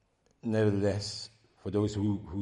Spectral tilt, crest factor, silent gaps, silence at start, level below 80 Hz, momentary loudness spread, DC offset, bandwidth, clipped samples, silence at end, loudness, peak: -6.5 dB/octave; 16 dB; none; 0.45 s; -60 dBFS; 14 LU; under 0.1%; 11 kHz; under 0.1%; 0 s; -32 LUFS; -16 dBFS